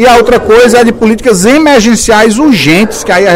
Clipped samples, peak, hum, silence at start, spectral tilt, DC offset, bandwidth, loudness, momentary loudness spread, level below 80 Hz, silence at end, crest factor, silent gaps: 8%; 0 dBFS; none; 0 s; -4 dB/octave; under 0.1%; 16.5 kHz; -5 LUFS; 4 LU; -28 dBFS; 0 s; 4 dB; none